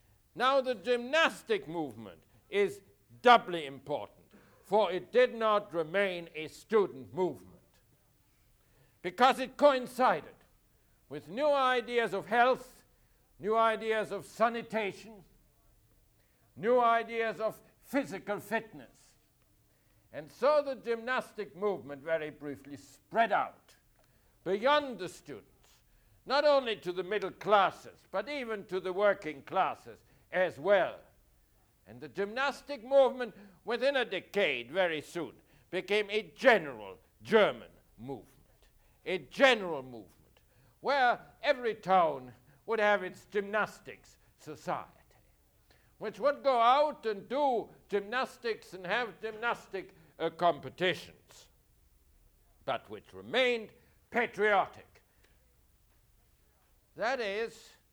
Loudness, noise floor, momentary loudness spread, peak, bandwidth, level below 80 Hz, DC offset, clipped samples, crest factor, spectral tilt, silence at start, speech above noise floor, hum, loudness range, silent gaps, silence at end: -31 LUFS; -69 dBFS; 18 LU; -10 dBFS; over 20 kHz; -70 dBFS; under 0.1%; under 0.1%; 24 dB; -4.5 dB/octave; 0.35 s; 37 dB; none; 5 LU; none; 0.35 s